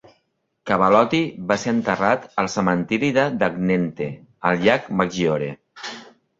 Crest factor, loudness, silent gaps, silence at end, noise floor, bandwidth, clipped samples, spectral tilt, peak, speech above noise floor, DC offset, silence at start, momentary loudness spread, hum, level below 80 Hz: 20 dB; -21 LUFS; none; 0.35 s; -70 dBFS; 7.8 kHz; under 0.1%; -6 dB/octave; -2 dBFS; 51 dB; under 0.1%; 0.65 s; 15 LU; none; -56 dBFS